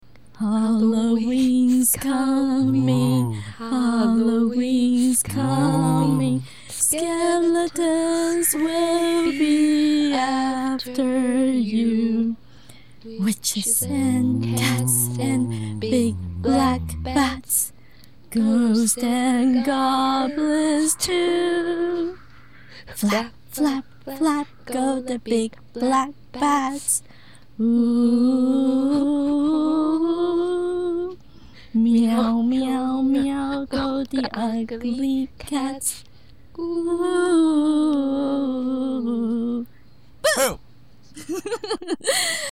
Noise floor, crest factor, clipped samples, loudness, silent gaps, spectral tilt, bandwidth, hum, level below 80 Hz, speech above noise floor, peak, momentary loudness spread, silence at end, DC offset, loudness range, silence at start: -52 dBFS; 14 dB; under 0.1%; -21 LUFS; none; -4.5 dB/octave; 16 kHz; none; -50 dBFS; 31 dB; -6 dBFS; 9 LU; 0 s; 0.6%; 5 LU; 0.4 s